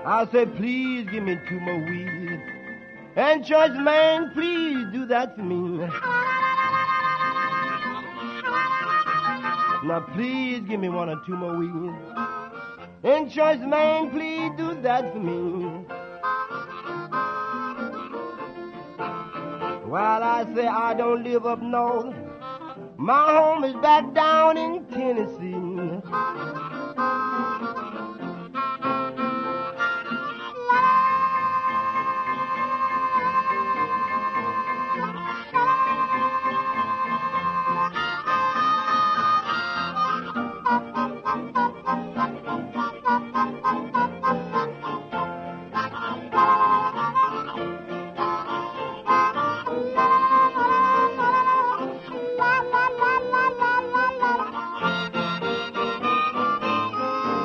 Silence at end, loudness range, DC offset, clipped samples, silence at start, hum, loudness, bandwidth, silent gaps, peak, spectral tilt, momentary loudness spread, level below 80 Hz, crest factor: 0 s; 7 LU; under 0.1%; under 0.1%; 0 s; none; -24 LUFS; 6.6 kHz; none; -6 dBFS; -6 dB/octave; 13 LU; -64 dBFS; 16 dB